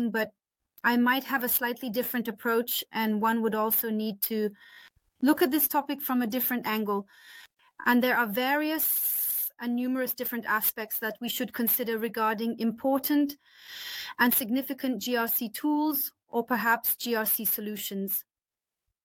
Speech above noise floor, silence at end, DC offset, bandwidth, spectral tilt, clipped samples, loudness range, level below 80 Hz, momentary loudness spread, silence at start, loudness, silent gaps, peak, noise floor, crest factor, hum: over 62 dB; 0.85 s; under 0.1%; 17.5 kHz; -3 dB/octave; under 0.1%; 2 LU; -74 dBFS; 8 LU; 0 s; -27 LUFS; none; -12 dBFS; under -90 dBFS; 18 dB; none